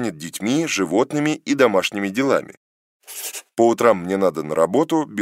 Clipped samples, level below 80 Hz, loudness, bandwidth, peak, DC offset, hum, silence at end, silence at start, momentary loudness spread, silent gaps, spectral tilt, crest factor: under 0.1%; -66 dBFS; -20 LUFS; 16 kHz; 0 dBFS; under 0.1%; none; 0 s; 0 s; 11 LU; 2.57-3.00 s; -4.5 dB/octave; 20 dB